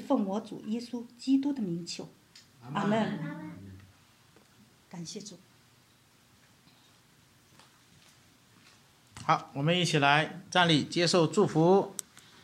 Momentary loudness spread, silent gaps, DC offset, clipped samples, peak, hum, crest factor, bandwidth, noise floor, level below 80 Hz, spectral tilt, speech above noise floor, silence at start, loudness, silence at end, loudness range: 19 LU; none; under 0.1%; under 0.1%; -8 dBFS; none; 24 dB; 15 kHz; -63 dBFS; -74 dBFS; -5 dB/octave; 34 dB; 0 s; -28 LUFS; 0.5 s; 23 LU